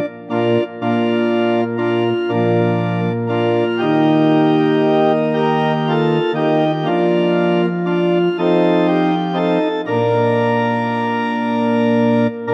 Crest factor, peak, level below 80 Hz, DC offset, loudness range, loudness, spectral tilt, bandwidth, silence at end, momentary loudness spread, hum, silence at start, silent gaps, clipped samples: 12 dB; -4 dBFS; -76 dBFS; under 0.1%; 2 LU; -16 LUFS; -8.5 dB/octave; 7.2 kHz; 0 s; 4 LU; none; 0 s; none; under 0.1%